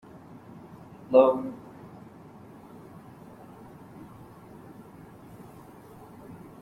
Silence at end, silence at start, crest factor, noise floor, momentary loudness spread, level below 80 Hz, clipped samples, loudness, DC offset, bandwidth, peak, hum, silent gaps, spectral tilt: 0.25 s; 0.55 s; 26 dB; -49 dBFS; 26 LU; -68 dBFS; under 0.1%; -23 LUFS; under 0.1%; 13 kHz; -6 dBFS; none; none; -8 dB/octave